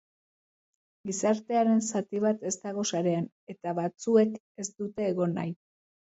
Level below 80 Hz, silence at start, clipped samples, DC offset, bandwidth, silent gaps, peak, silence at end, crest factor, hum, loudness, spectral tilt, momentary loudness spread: -76 dBFS; 1.05 s; under 0.1%; under 0.1%; 8.2 kHz; 3.32-3.47 s, 4.40-4.55 s; -12 dBFS; 0.6 s; 18 dB; none; -29 LUFS; -5.5 dB/octave; 13 LU